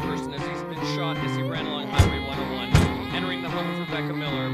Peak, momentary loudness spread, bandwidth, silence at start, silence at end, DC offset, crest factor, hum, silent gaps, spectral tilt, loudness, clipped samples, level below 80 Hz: -4 dBFS; 8 LU; 15 kHz; 0 s; 0 s; under 0.1%; 22 dB; none; none; -6 dB/octave; -26 LUFS; under 0.1%; -36 dBFS